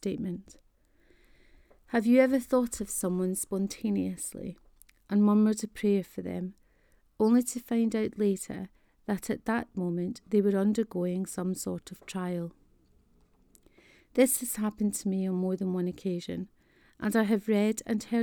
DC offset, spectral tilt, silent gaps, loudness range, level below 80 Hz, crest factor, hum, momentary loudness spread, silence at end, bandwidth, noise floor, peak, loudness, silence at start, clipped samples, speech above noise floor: under 0.1%; -6 dB/octave; none; 3 LU; -62 dBFS; 20 dB; none; 13 LU; 0 s; over 20 kHz; -65 dBFS; -10 dBFS; -29 LUFS; 0.05 s; under 0.1%; 36 dB